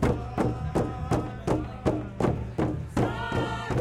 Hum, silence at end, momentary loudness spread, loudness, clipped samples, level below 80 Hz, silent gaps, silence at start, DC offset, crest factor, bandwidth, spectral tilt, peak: none; 0 s; 2 LU; -29 LUFS; under 0.1%; -40 dBFS; none; 0 s; under 0.1%; 18 dB; 13 kHz; -7.5 dB/octave; -10 dBFS